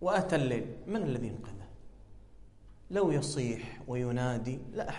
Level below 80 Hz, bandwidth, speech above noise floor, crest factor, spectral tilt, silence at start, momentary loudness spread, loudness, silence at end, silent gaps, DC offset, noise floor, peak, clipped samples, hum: -54 dBFS; 11.5 kHz; 21 dB; 20 dB; -6 dB/octave; 0 s; 13 LU; -33 LUFS; 0 s; none; under 0.1%; -53 dBFS; -14 dBFS; under 0.1%; 50 Hz at -60 dBFS